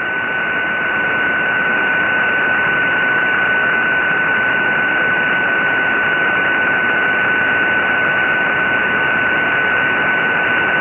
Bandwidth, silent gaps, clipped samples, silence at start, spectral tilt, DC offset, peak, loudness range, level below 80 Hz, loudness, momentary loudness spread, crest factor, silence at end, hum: 3.8 kHz; none; under 0.1%; 0 s; -6 dB/octave; under 0.1%; -4 dBFS; 0 LU; -50 dBFS; -14 LUFS; 1 LU; 12 dB; 0 s; none